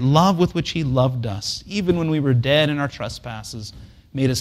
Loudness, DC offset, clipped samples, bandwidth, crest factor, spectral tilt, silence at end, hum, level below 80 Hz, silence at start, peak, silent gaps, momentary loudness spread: -20 LUFS; under 0.1%; under 0.1%; 15 kHz; 18 dB; -6 dB/octave; 0 s; none; -44 dBFS; 0 s; -2 dBFS; none; 15 LU